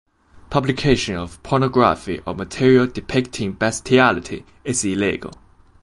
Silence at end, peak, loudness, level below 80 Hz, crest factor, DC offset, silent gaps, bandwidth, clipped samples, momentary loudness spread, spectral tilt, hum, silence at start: 0.5 s; -2 dBFS; -19 LUFS; -42 dBFS; 18 dB; under 0.1%; none; 11.5 kHz; under 0.1%; 13 LU; -5 dB/octave; none; 0.5 s